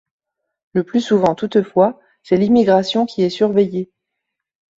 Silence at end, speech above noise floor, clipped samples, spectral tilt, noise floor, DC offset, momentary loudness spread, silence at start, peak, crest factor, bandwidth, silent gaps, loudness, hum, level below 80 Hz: 0.95 s; 63 dB; under 0.1%; -7 dB/octave; -79 dBFS; under 0.1%; 9 LU; 0.75 s; -2 dBFS; 16 dB; 7.8 kHz; none; -17 LUFS; none; -58 dBFS